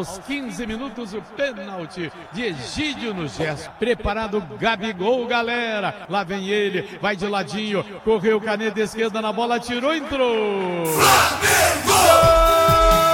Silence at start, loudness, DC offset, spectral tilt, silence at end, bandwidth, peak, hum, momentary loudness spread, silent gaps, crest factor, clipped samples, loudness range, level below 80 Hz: 0 s; -20 LUFS; under 0.1%; -3.5 dB/octave; 0 s; 17 kHz; -2 dBFS; none; 14 LU; none; 18 dB; under 0.1%; 10 LU; -36 dBFS